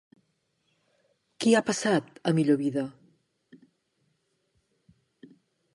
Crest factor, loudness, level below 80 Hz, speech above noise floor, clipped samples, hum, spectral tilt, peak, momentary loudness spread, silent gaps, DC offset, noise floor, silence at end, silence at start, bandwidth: 22 dB; -26 LUFS; -76 dBFS; 49 dB; under 0.1%; none; -5 dB/octave; -10 dBFS; 8 LU; none; under 0.1%; -74 dBFS; 2.85 s; 1.4 s; 11.5 kHz